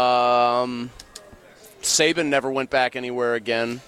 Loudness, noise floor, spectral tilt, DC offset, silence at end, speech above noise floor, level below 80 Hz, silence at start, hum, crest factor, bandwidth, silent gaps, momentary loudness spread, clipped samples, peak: -21 LUFS; -47 dBFS; -2.5 dB/octave; under 0.1%; 0.05 s; 24 dB; -58 dBFS; 0 s; none; 16 dB; 16.5 kHz; none; 15 LU; under 0.1%; -6 dBFS